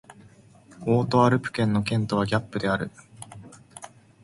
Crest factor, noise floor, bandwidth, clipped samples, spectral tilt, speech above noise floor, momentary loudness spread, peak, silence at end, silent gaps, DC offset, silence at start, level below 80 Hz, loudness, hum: 20 dB; -52 dBFS; 11.5 kHz; under 0.1%; -6.5 dB/octave; 29 dB; 24 LU; -6 dBFS; 0.35 s; none; under 0.1%; 0.1 s; -56 dBFS; -24 LUFS; none